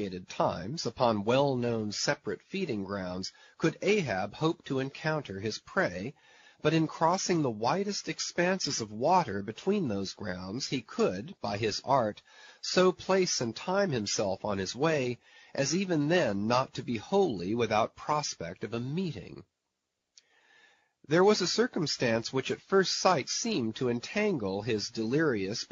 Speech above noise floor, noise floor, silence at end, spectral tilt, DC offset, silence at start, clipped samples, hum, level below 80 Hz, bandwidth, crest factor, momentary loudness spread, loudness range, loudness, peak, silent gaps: 54 dB; -84 dBFS; 0.05 s; -4 dB/octave; under 0.1%; 0 s; under 0.1%; none; -66 dBFS; 7.6 kHz; 22 dB; 10 LU; 4 LU; -30 LUFS; -8 dBFS; none